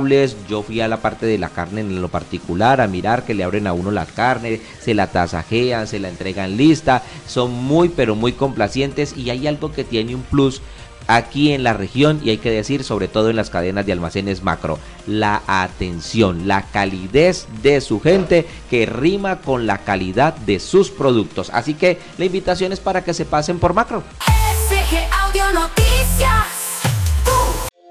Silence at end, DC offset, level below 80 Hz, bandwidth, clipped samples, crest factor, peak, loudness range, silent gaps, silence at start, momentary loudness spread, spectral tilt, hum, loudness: 0.2 s; under 0.1%; -28 dBFS; 16 kHz; under 0.1%; 14 dB; -2 dBFS; 3 LU; none; 0 s; 8 LU; -5 dB/octave; none; -18 LUFS